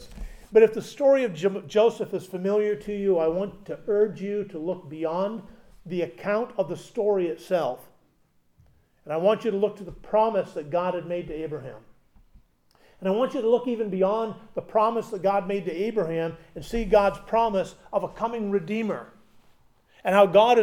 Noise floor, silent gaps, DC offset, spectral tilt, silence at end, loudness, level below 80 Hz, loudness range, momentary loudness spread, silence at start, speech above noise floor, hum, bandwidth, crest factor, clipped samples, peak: -64 dBFS; none; under 0.1%; -6.5 dB/octave; 0 s; -25 LUFS; -50 dBFS; 4 LU; 12 LU; 0 s; 40 dB; none; 15 kHz; 20 dB; under 0.1%; -6 dBFS